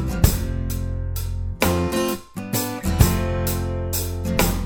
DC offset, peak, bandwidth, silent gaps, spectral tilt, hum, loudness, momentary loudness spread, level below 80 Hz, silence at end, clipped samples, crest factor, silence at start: under 0.1%; 0 dBFS; over 20 kHz; none; -5 dB/octave; none; -23 LUFS; 9 LU; -28 dBFS; 0 s; under 0.1%; 22 dB; 0 s